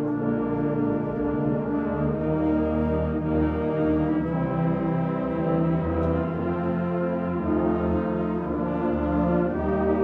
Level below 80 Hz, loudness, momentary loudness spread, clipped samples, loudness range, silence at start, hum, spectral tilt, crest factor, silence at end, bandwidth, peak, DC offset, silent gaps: -38 dBFS; -25 LUFS; 3 LU; under 0.1%; 1 LU; 0 s; none; -11 dB/octave; 14 dB; 0 s; 4.4 kHz; -12 dBFS; under 0.1%; none